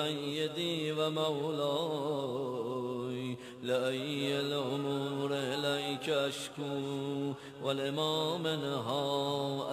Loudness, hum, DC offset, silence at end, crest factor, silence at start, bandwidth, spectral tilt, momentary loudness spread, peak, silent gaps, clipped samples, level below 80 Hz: -34 LUFS; none; under 0.1%; 0 s; 16 dB; 0 s; 14.5 kHz; -5 dB/octave; 5 LU; -18 dBFS; none; under 0.1%; -76 dBFS